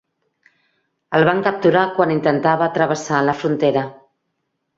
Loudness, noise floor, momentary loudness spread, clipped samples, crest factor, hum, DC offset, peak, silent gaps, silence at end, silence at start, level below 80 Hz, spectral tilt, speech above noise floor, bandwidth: -17 LUFS; -73 dBFS; 4 LU; under 0.1%; 18 dB; none; under 0.1%; -2 dBFS; none; 0.85 s; 1.1 s; -60 dBFS; -6 dB/octave; 56 dB; 7.8 kHz